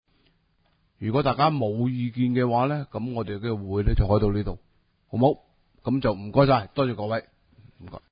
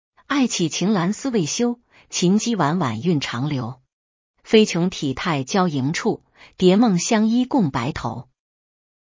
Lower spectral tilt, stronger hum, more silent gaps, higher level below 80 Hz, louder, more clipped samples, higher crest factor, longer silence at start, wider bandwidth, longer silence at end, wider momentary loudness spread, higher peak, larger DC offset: first, -12 dB/octave vs -5 dB/octave; neither; second, none vs 3.93-4.34 s; first, -36 dBFS vs -52 dBFS; second, -25 LUFS vs -20 LUFS; neither; about the same, 20 dB vs 18 dB; first, 1 s vs 0.3 s; second, 5.2 kHz vs 7.6 kHz; second, 0.15 s vs 0.85 s; about the same, 12 LU vs 10 LU; about the same, -4 dBFS vs -2 dBFS; neither